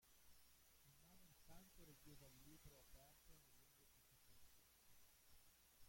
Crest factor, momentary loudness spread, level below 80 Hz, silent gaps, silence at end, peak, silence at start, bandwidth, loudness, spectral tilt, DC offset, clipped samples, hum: 18 dB; 2 LU; -76 dBFS; none; 0 s; -50 dBFS; 0 s; 16.5 kHz; -67 LUFS; -3 dB/octave; under 0.1%; under 0.1%; none